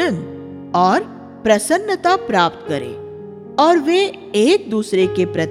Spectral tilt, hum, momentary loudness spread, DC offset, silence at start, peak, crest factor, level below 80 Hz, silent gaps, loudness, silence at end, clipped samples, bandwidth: -4.5 dB/octave; none; 17 LU; under 0.1%; 0 s; -2 dBFS; 16 dB; -56 dBFS; none; -17 LUFS; 0 s; under 0.1%; 15 kHz